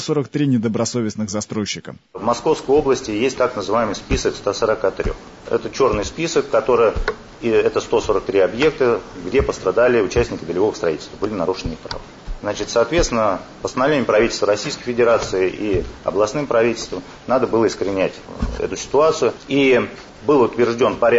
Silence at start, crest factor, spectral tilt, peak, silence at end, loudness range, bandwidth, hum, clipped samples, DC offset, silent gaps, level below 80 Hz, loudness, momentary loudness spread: 0 s; 14 dB; -5 dB/octave; -6 dBFS; 0 s; 2 LU; 8 kHz; none; under 0.1%; under 0.1%; none; -36 dBFS; -19 LUFS; 10 LU